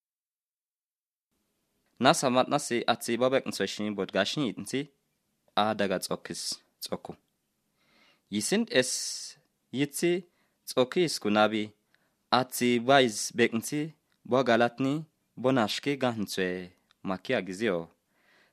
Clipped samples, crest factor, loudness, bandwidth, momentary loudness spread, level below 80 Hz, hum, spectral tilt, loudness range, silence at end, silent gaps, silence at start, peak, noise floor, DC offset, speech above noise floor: under 0.1%; 26 dB; -28 LUFS; 14 kHz; 13 LU; -76 dBFS; none; -4 dB/octave; 6 LU; 0.65 s; none; 2 s; -4 dBFS; under -90 dBFS; under 0.1%; over 62 dB